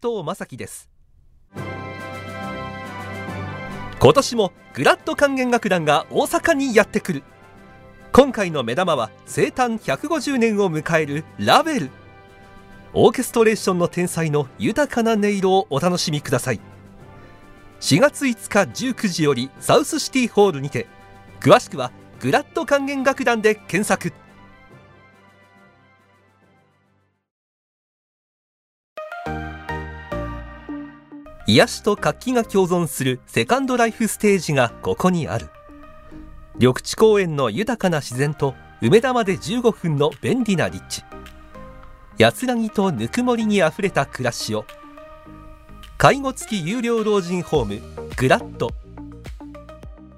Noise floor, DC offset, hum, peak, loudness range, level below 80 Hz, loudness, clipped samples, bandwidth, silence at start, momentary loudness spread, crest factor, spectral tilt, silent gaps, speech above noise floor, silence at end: -64 dBFS; under 0.1%; none; 0 dBFS; 5 LU; -46 dBFS; -20 LUFS; under 0.1%; 16 kHz; 0.05 s; 16 LU; 20 dB; -5 dB/octave; 27.31-28.96 s; 45 dB; 0.1 s